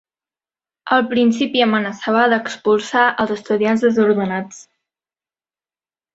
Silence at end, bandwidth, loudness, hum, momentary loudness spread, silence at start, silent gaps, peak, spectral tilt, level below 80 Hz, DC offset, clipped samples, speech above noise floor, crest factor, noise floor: 1.55 s; 8 kHz; -17 LUFS; none; 7 LU; 0.85 s; none; -2 dBFS; -5 dB/octave; -62 dBFS; under 0.1%; under 0.1%; over 74 dB; 16 dB; under -90 dBFS